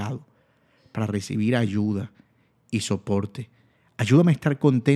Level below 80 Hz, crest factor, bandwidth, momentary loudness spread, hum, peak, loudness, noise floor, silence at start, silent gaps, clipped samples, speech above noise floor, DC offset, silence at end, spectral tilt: -64 dBFS; 20 dB; 13 kHz; 19 LU; none; -4 dBFS; -24 LUFS; -62 dBFS; 0 s; none; under 0.1%; 40 dB; under 0.1%; 0 s; -7 dB/octave